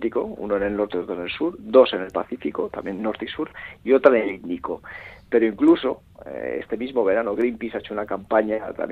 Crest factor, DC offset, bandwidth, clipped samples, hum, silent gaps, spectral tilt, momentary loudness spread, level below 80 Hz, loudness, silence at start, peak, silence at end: 22 dB; under 0.1%; 4.8 kHz; under 0.1%; none; none; -7.5 dB/octave; 14 LU; -54 dBFS; -23 LUFS; 0 s; 0 dBFS; 0 s